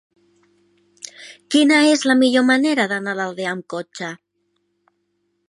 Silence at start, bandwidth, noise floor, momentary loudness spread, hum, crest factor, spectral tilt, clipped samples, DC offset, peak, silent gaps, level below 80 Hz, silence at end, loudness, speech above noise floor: 1.05 s; 11.5 kHz; -70 dBFS; 22 LU; none; 18 dB; -3.5 dB/octave; under 0.1%; under 0.1%; -2 dBFS; none; -76 dBFS; 1.35 s; -17 LUFS; 52 dB